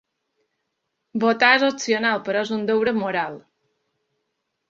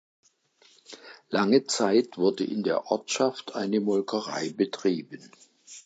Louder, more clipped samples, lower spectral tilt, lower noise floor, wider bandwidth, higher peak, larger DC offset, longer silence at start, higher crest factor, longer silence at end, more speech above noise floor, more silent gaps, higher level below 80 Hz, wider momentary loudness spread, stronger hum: first, -20 LUFS vs -27 LUFS; neither; about the same, -3.5 dB/octave vs -4.5 dB/octave; first, -77 dBFS vs -62 dBFS; second, 7.8 kHz vs 9.2 kHz; first, -2 dBFS vs -8 dBFS; neither; first, 1.15 s vs 0.9 s; about the same, 22 dB vs 20 dB; first, 1.3 s vs 0.05 s; first, 57 dB vs 36 dB; neither; first, -68 dBFS vs -78 dBFS; second, 10 LU vs 23 LU; neither